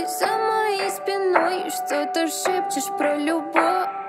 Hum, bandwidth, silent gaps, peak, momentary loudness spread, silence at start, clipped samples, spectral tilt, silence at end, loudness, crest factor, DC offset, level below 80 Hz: none; 16 kHz; none; -2 dBFS; 5 LU; 0 s; under 0.1%; -2 dB/octave; 0 s; -22 LUFS; 20 dB; under 0.1%; -80 dBFS